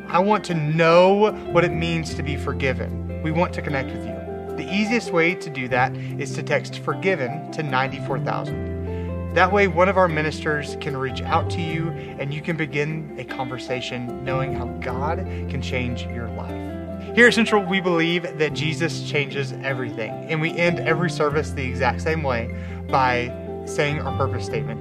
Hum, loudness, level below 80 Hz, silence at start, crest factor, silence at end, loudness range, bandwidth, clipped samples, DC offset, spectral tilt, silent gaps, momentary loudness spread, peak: none; -22 LUFS; -42 dBFS; 0 s; 22 dB; 0 s; 6 LU; 13 kHz; under 0.1%; under 0.1%; -6 dB/octave; none; 12 LU; 0 dBFS